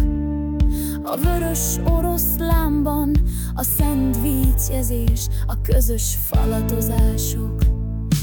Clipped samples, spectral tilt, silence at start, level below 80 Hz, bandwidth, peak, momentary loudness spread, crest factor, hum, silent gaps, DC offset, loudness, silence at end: under 0.1%; -6 dB/octave; 0 s; -22 dBFS; 19 kHz; -4 dBFS; 5 LU; 14 dB; none; none; under 0.1%; -20 LUFS; 0 s